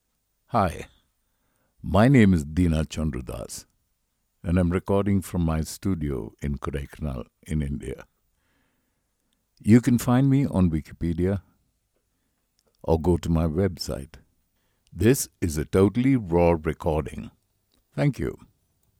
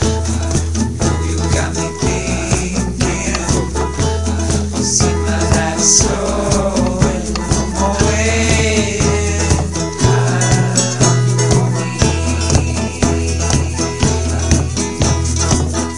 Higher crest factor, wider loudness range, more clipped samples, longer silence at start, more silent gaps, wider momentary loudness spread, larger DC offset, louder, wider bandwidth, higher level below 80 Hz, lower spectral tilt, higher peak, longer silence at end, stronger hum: first, 20 dB vs 14 dB; first, 6 LU vs 3 LU; neither; first, 0.55 s vs 0 s; neither; first, 16 LU vs 5 LU; second, under 0.1% vs 2%; second, -24 LUFS vs -15 LUFS; first, 17.5 kHz vs 11.5 kHz; second, -40 dBFS vs -26 dBFS; first, -7 dB/octave vs -4.5 dB/octave; second, -6 dBFS vs 0 dBFS; first, 0.65 s vs 0 s; neither